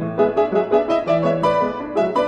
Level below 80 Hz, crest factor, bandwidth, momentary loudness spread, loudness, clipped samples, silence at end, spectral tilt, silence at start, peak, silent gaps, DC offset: -50 dBFS; 14 dB; 9 kHz; 3 LU; -19 LUFS; under 0.1%; 0 s; -7.5 dB/octave; 0 s; -4 dBFS; none; under 0.1%